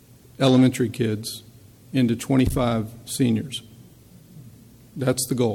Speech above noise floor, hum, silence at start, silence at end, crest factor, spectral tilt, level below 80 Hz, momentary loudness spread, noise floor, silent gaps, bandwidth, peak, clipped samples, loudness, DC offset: 27 dB; none; 0.4 s; 0 s; 16 dB; -5.5 dB/octave; -44 dBFS; 15 LU; -49 dBFS; none; 16.5 kHz; -6 dBFS; under 0.1%; -22 LUFS; under 0.1%